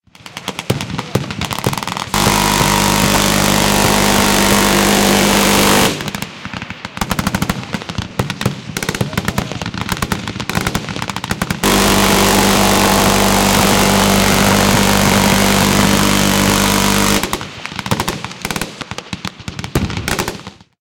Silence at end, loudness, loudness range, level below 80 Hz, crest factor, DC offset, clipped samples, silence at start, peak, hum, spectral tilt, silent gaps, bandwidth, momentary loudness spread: 0.3 s; -13 LUFS; 9 LU; -30 dBFS; 14 dB; under 0.1%; under 0.1%; 0.25 s; 0 dBFS; none; -3.5 dB/octave; none; 17.5 kHz; 13 LU